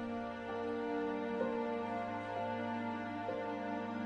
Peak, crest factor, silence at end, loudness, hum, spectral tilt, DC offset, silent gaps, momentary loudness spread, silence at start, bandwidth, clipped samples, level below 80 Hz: -24 dBFS; 14 dB; 0 s; -39 LUFS; none; -7 dB/octave; under 0.1%; none; 3 LU; 0 s; 9.2 kHz; under 0.1%; -72 dBFS